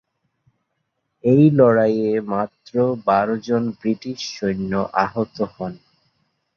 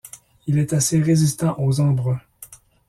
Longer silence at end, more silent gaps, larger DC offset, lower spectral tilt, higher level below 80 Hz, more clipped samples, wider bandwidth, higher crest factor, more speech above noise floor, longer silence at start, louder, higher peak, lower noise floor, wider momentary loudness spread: first, 0.8 s vs 0.35 s; neither; neither; first, -7.5 dB/octave vs -6 dB/octave; about the same, -56 dBFS vs -52 dBFS; neither; second, 7 kHz vs 14.5 kHz; about the same, 18 dB vs 14 dB; first, 55 dB vs 27 dB; first, 1.25 s vs 0.05 s; about the same, -19 LUFS vs -20 LUFS; first, -2 dBFS vs -6 dBFS; first, -74 dBFS vs -45 dBFS; about the same, 12 LU vs 11 LU